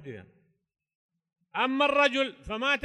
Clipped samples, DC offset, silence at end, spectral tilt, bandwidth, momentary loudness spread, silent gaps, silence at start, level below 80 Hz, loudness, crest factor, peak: under 0.1%; under 0.1%; 0.05 s; -3.5 dB/octave; 11.5 kHz; 19 LU; 0.95-1.09 s; 0 s; -60 dBFS; -26 LUFS; 20 dB; -10 dBFS